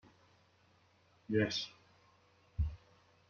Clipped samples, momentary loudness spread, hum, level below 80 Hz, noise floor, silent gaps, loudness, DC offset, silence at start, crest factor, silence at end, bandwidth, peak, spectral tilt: under 0.1%; 21 LU; none; -52 dBFS; -70 dBFS; none; -38 LUFS; under 0.1%; 1.3 s; 22 dB; 0.55 s; 7.2 kHz; -20 dBFS; -5 dB/octave